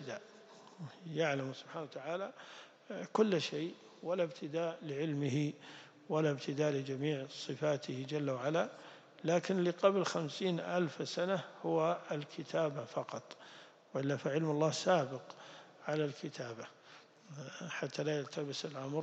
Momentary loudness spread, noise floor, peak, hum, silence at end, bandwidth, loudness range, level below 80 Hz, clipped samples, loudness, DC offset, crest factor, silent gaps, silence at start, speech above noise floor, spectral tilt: 19 LU; -60 dBFS; -14 dBFS; none; 0 s; 8.6 kHz; 4 LU; -90 dBFS; under 0.1%; -37 LUFS; under 0.1%; 22 dB; none; 0 s; 23 dB; -5.5 dB/octave